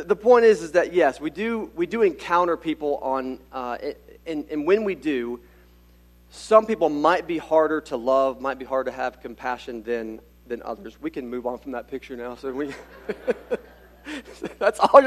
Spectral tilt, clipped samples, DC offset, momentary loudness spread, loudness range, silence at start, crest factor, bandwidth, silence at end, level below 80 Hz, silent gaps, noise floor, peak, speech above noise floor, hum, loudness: -5 dB/octave; under 0.1%; under 0.1%; 17 LU; 10 LU; 0 s; 24 dB; 13.5 kHz; 0 s; -54 dBFS; none; -53 dBFS; 0 dBFS; 30 dB; 60 Hz at -55 dBFS; -24 LUFS